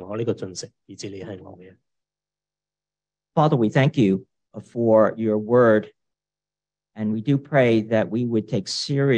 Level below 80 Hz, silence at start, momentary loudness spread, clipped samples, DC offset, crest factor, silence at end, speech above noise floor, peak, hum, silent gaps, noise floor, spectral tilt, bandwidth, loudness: -68 dBFS; 0 s; 18 LU; under 0.1%; under 0.1%; 18 dB; 0 s; over 69 dB; -4 dBFS; 50 Hz at -50 dBFS; none; under -90 dBFS; -6.5 dB/octave; 9.8 kHz; -21 LUFS